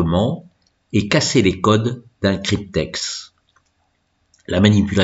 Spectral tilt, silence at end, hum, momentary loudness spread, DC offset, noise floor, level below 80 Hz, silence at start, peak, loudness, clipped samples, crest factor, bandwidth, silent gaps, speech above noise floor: -5.5 dB/octave; 0 s; none; 10 LU; under 0.1%; -66 dBFS; -42 dBFS; 0 s; 0 dBFS; -18 LUFS; under 0.1%; 18 dB; 8 kHz; none; 49 dB